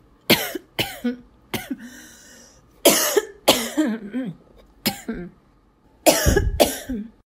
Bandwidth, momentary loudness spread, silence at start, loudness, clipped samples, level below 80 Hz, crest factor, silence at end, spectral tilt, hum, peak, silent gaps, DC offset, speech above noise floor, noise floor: 16 kHz; 17 LU; 0.3 s; -21 LUFS; under 0.1%; -36 dBFS; 24 dB; 0.2 s; -3 dB/octave; none; 0 dBFS; none; under 0.1%; 27 dB; -57 dBFS